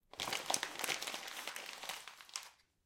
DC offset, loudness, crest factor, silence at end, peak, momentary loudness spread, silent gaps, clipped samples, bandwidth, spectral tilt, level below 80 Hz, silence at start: under 0.1%; -41 LUFS; 32 dB; 0.3 s; -12 dBFS; 11 LU; none; under 0.1%; 17 kHz; 0.5 dB/octave; -78 dBFS; 0.15 s